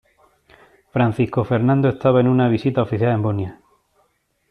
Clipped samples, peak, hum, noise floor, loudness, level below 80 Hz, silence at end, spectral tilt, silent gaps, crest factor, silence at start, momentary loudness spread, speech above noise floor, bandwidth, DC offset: under 0.1%; -4 dBFS; none; -65 dBFS; -19 LUFS; -54 dBFS; 1 s; -10 dB/octave; none; 16 dB; 0.95 s; 8 LU; 48 dB; 5.2 kHz; under 0.1%